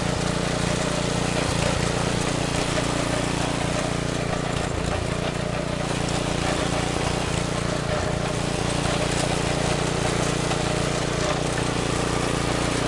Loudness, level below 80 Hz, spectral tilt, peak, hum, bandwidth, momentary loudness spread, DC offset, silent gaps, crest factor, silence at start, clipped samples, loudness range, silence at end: -24 LUFS; -36 dBFS; -4.5 dB/octave; -8 dBFS; none; 11.5 kHz; 2 LU; under 0.1%; none; 16 dB; 0 s; under 0.1%; 2 LU; 0 s